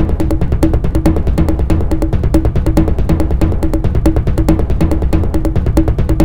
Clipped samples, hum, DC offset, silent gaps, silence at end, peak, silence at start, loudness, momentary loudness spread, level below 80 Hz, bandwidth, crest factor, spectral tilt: 0.2%; none; 9%; none; 0 s; 0 dBFS; 0 s; -14 LUFS; 2 LU; -16 dBFS; 16.5 kHz; 12 dB; -8.5 dB/octave